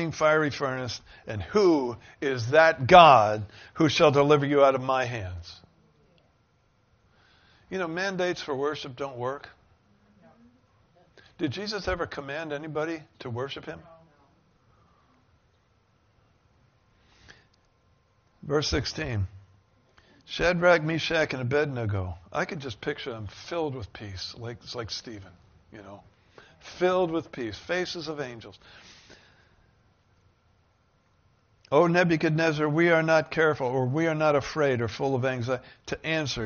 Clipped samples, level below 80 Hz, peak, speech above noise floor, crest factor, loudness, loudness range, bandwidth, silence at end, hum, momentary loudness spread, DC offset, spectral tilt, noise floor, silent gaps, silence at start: under 0.1%; -54 dBFS; -2 dBFS; 41 dB; 26 dB; -25 LUFS; 16 LU; 6.8 kHz; 0 s; none; 17 LU; under 0.1%; -4 dB/octave; -66 dBFS; none; 0 s